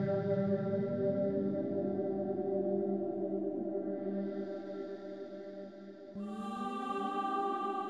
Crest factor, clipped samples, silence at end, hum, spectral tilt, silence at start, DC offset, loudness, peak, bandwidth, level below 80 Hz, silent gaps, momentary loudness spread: 14 dB; under 0.1%; 0 s; none; -9 dB/octave; 0 s; under 0.1%; -36 LUFS; -22 dBFS; 10 kHz; -78 dBFS; none; 12 LU